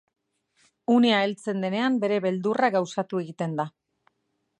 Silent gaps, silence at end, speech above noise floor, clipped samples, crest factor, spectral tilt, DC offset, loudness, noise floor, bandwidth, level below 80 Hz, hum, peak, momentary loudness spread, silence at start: none; 0.9 s; 52 dB; under 0.1%; 18 dB; -6 dB/octave; under 0.1%; -25 LUFS; -76 dBFS; 10 kHz; -78 dBFS; none; -8 dBFS; 10 LU; 0.9 s